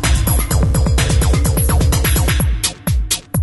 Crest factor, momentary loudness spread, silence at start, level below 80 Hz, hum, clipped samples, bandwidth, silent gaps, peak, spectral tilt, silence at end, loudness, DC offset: 12 dB; 4 LU; 0 s; -18 dBFS; none; under 0.1%; 12 kHz; none; -2 dBFS; -4.5 dB/octave; 0 s; -15 LUFS; under 0.1%